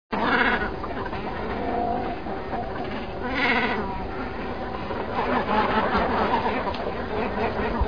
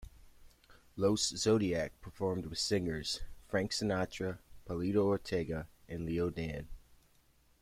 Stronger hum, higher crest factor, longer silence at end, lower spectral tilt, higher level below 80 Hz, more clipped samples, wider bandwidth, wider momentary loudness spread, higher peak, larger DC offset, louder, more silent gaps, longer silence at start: neither; about the same, 18 dB vs 18 dB; second, 0 s vs 0.8 s; first, -7 dB/octave vs -4.5 dB/octave; first, -40 dBFS vs -54 dBFS; neither; second, 5.2 kHz vs 16 kHz; about the same, 10 LU vs 12 LU; first, -6 dBFS vs -18 dBFS; first, 1% vs under 0.1%; first, -26 LUFS vs -35 LUFS; neither; about the same, 0.1 s vs 0 s